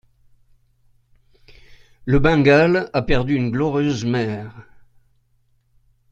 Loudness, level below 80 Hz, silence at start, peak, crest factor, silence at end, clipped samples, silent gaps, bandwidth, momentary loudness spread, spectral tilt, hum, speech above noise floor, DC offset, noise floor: -18 LUFS; -36 dBFS; 2.05 s; -2 dBFS; 20 dB; 1.5 s; under 0.1%; none; 7.8 kHz; 14 LU; -7 dB/octave; none; 45 dB; under 0.1%; -62 dBFS